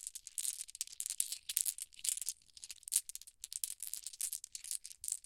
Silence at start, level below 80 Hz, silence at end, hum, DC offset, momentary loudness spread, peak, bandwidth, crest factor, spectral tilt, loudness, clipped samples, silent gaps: 0 s; -78 dBFS; 0.05 s; none; under 0.1%; 11 LU; -8 dBFS; 17 kHz; 36 dB; 4.5 dB/octave; -39 LUFS; under 0.1%; none